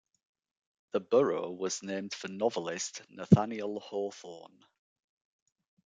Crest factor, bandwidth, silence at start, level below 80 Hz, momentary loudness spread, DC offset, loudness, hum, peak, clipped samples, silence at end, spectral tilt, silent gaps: 26 dB; 9.4 kHz; 0.95 s; -72 dBFS; 15 LU; under 0.1%; -32 LUFS; none; -6 dBFS; under 0.1%; 1.4 s; -6 dB/octave; none